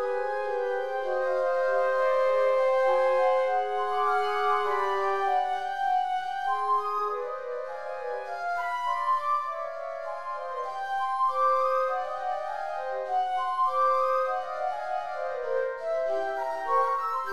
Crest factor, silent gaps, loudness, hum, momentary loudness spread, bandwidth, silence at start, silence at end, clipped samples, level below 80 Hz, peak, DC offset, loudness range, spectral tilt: 14 dB; none; -28 LUFS; none; 10 LU; 12.5 kHz; 0 s; 0 s; under 0.1%; -70 dBFS; -14 dBFS; 0.6%; 5 LU; -3 dB/octave